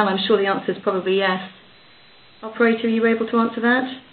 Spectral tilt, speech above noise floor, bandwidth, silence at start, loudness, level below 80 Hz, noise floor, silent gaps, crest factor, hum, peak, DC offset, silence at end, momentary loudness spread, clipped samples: -10 dB/octave; 30 dB; 4.6 kHz; 0 s; -20 LUFS; -66 dBFS; -50 dBFS; none; 18 dB; none; -4 dBFS; under 0.1%; 0.1 s; 9 LU; under 0.1%